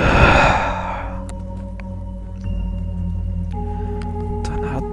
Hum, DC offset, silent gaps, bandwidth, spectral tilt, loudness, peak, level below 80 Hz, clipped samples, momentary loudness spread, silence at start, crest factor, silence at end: none; under 0.1%; none; 11 kHz; -6 dB/octave; -21 LUFS; 0 dBFS; -26 dBFS; under 0.1%; 18 LU; 0 s; 20 dB; 0 s